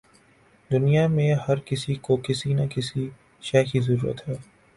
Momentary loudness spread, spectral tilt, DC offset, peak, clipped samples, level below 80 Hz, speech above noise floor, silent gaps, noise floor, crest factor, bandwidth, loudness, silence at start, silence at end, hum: 13 LU; -7 dB/octave; under 0.1%; -4 dBFS; under 0.1%; -54 dBFS; 35 dB; none; -58 dBFS; 20 dB; 11.5 kHz; -24 LUFS; 0.7 s; 0.35 s; none